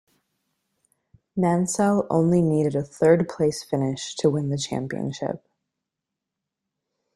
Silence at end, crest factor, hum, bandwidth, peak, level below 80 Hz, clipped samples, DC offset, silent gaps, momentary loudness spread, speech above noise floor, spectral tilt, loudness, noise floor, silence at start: 1.8 s; 20 dB; none; 12.5 kHz; -6 dBFS; -60 dBFS; under 0.1%; under 0.1%; none; 10 LU; 63 dB; -6 dB/octave; -23 LUFS; -85 dBFS; 1.35 s